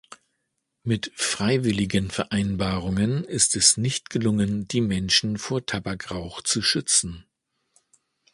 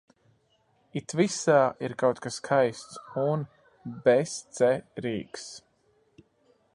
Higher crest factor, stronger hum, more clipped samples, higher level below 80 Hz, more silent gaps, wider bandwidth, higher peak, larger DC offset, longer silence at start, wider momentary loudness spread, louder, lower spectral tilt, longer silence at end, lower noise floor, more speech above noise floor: about the same, 22 dB vs 20 dB; neither; neither; first, -48 dBFS vs -70 dBFS; neither; about the same, 11.5 kHz vs 11.5 kHz; first, -4 dBFS vs -8 dBFS; neither; second, 0.1 s vs 0.95 s; second, 11 LU vs 19 LU; first, -23 LUFS vs -27 LUFS; second, -3.5 dB/octave vs -5 dB/octave; about the same, 1.1 s vs 1.15 s; first, -77 dBFS vs -68 dBFS; first, 53 dB vs 41 dB